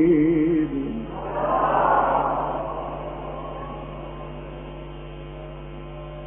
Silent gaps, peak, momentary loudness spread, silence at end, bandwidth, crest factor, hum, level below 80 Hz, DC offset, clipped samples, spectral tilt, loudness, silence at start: none; -8 dBFS; 18 LU; 0 s; 3.6 kHz; 16 dB; none; -40 dBFS; under 0.1%; under 0.1%; -4 dB/octave; -24 LUFS; 0 s